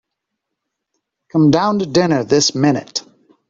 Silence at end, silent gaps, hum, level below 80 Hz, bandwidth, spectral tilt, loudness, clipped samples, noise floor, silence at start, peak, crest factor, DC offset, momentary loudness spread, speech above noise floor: 0.5 s; none; none; -54 dBFS; 7.8 kHz; -5 dB/octave; -15 LUFS; under 0.1%; -78 dBFS; 1.35 s; 0 dBFS; 16 dB; under 0.1%; 9 LU; 64 dB